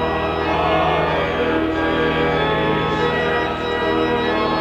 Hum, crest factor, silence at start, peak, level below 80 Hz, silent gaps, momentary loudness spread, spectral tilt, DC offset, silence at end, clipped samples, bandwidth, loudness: 60 Hz at -35 dBFS; 12 dB; 0 s; -6 dBFS; -38 dBFS; none; 3 LU; -6.5 dB/octave; under 0.1%; 0 s; under 0.1%; 11.5 kHz; -19 LUFS